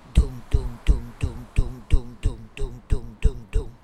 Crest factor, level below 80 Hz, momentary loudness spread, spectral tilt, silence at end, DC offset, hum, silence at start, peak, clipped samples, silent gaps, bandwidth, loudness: 18 dB; -24 dBFS; 6 LU; -7 dB/octave; 0.1 s; under 0.1%; none; 0.15 s; -4 dBFS; under 0.1%; none; 10 kHz; -29 LUFS